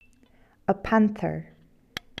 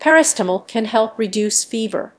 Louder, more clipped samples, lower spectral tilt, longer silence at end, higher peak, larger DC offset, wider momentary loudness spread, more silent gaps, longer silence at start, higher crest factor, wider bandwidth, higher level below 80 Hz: second, -26 LUFS vs -18 LUFS; neither; first, -7 dB/octave vs -2.5 dB/octave; first, 0.75 s vs 0.1 s; second, -8 dBFS vs 0 dBFS; neither; first, 17 LU vs 9 LU; neither; first, 0.7 s vs 0 s; about the same, 20 dB vs 18 dB; first, 12.5 kHz vs 11 kHz; first, -52 dBFS vs -72 dBFS